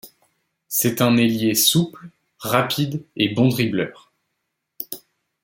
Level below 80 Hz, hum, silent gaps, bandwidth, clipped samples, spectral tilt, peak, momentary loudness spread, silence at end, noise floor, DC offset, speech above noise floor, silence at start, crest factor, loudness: -62 dBFS; none; none; 17 kHz; under 0.1%; -4 dB/octave; -2 dBFS; 16 LU; 0.45 s; -77 dBFS; under 0.1%; 58 dB; 0.05 s; 20 dB; -19 LUFS